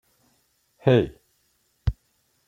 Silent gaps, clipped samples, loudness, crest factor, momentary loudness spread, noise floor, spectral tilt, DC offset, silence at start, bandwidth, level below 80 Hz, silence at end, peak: none; under 0.1%; -24 LUFS; 22 dB; 12 LU; -69 dBFS; -8.5 dB/octave; under 0.1%; 0.85 s; 7.2 kHz; -40 dBFS; 0.55 s; -4 dBFS